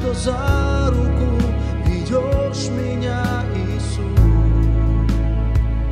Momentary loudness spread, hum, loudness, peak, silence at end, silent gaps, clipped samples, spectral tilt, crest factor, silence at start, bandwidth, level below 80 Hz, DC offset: 6 LU; none; -19 LUFS; -2 dBFS; 0 s; none; under 0.1%; -7 dB/octave; 14 dB; 0 s; 10.5 kHz; -20 dBFS; under 0.1%